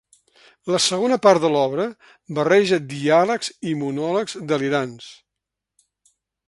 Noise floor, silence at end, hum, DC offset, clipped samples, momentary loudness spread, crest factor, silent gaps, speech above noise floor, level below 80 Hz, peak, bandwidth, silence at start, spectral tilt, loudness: -84 dBFS; 1.35 s; none; under 0.1%; under 0.1%; 13 LU; 20 dB; none; 64 dB; -66 dBFS; 0 dBFS; 11.5 kHz; 0.65 s; -4.5 dB/octave; -20 LUFS